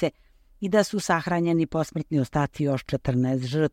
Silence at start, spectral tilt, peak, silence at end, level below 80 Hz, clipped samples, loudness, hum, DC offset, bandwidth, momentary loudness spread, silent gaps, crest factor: 0 s; -6.5 dB/octave; -6 dBFS; 0.05 s; -50 dBFS; under 0.1%; -25 LUFS; none; under 0.1%; 16 kHz; 4 LU; none; 20 dB